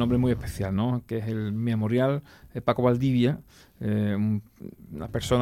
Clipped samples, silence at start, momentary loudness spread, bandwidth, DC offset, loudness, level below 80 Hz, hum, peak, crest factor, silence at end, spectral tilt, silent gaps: under 0.1%; 0 s; 13 LU; 15.5 kHz; under 0.1%; -27 LUFS; -48 dBFS; none; -10 dBFS; 16 dB; 0 s; -7.5 dB/octave; none